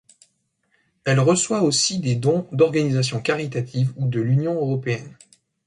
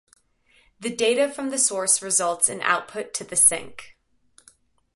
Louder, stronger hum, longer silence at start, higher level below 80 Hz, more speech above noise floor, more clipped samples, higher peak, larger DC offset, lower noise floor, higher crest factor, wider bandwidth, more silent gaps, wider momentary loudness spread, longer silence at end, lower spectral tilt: about the same, -21 LUFS vs -21 LUFS; neither; first, 1.05 s vs 0.8 s; first, -60 dBFS vs -66 dBFS; first, 48 dB vs 38 dB; neither; about the same, -4 dBFS vs -4 dBFS; neither; first, -68 dBFS vs -61 dBFS; about the same, 18 dB vs 22 dB; about the same, 11.5 kHz vs 12 kHz; neither; second, 7 LU vs 15 LU; second, 0.55 s vs 1.05 s; first, -5 dB/octave vs -1 dB/octave